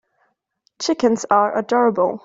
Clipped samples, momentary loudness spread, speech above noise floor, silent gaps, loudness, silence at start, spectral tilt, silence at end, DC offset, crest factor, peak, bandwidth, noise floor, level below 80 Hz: under 0.1%; 6 LU; 50 dB; none; -18 LUFS; 0.8 s; -4.5 dB/octave; 0.05 s; under 0.1%; 16 dB; -2 dBFS; 7.8 kHz; -67 dBFS; -64 dBFS